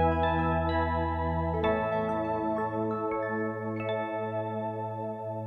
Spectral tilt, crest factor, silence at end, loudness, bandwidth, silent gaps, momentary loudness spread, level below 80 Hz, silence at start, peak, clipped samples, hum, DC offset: -9 dB/octave; 16 dB; 0 s; -30 LUFS; 4.9 kHz; none; 6 LU; -44 dBFS; 0 s; -14 dBFS; under 0.1%; none; under 0.1%